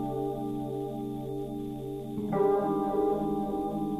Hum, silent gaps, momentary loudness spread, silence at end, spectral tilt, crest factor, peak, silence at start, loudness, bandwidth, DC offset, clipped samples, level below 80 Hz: none; none; 10 LU; 0 s; -9 dB/octave; 14 dB; -16 dBFS; 0 s; -31 LUFS; 14 kHz; under 0.1%; under 0.1%; -54 dBFS